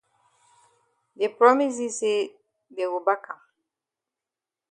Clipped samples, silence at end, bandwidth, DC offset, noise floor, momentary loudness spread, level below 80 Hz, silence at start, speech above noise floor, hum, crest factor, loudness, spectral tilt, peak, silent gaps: under 0.1%; 1.35 s; 10 kHz; under 0.1%; -89 dBFS; 21 LU; -82 dBFS; 1.2 s; 66 dB; none; 24 dB; -24 LUFS; -2.5 dB/octave; -2 dBFS; none